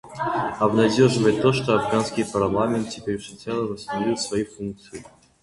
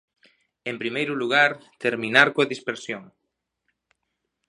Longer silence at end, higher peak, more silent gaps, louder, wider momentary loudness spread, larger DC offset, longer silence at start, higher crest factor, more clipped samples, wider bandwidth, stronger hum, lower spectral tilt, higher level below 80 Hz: second, 0.4 s vs 1.45 s; second, -4 dBFS vs 0 dBFS; neither; about the same, -22 LUFS vs -22 LUFS; second, 13 LU vs 16 LU; neither; second, 0.05 s vs 0.65 s; second, 18 dB vs 26 dB; neither; about the same, 11.5 kHz vs 11 kHz; neither; first, -5.5 dB/octave vs -4 dB/octave; first, -52 dBFS vs -74 dBFS